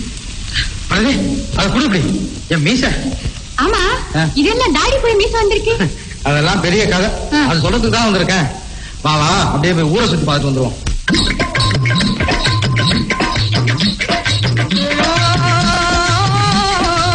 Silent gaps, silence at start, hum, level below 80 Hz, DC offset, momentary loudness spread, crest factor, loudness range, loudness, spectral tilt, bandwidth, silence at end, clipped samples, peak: none; 0 s; none; -26 dBFS; under 0.1%; 6 LU; 12 dB; 2 LU; -14 LUFS; -4.5 dB/octave; 10 kHz; 0 s; under 0.1%; -2 dBFS